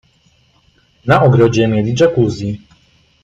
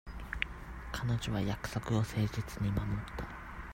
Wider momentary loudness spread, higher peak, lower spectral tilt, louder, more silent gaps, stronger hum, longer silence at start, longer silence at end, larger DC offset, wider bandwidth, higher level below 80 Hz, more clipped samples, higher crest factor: first, 14 LU vs 10 LU; first, 0 dBFS vs -14 dBFS; about the same, -7 dB/octave vs -6 dB/octave; first, -13 LUFS vs -37 LUFS; neither; neither; first, 1.05 s vs 0.05 s; first, 0.65 s vs 0 s; neither; second, 7.8 kHz vs 16 kHz; about the same, -44 dBFS vs -46 dBFS; neither; second, 14 dB vs 22 dB